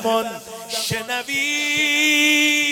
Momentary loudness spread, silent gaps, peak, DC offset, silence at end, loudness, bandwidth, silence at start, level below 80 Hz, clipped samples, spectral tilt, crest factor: 12 LU; none; -6 dBFS; under 0.1%; 0 s; -18 LUFS; 18 kHz; 0 s; -60 dBFS; under 0.1%; -1.5 dB/octave; 14 dB